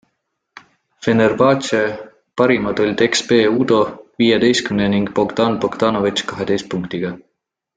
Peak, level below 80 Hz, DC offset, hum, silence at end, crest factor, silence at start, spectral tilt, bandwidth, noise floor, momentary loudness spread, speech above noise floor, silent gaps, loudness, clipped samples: -2 dBFS; -52 dBFS; under 0.1%; none; 0.6 s; 16 dB; 1 s; -5 dB/octave; 9.4 kHz; -72 dBFS; 10 LU; 56 dB; none; -17 LUFS; under 0.1%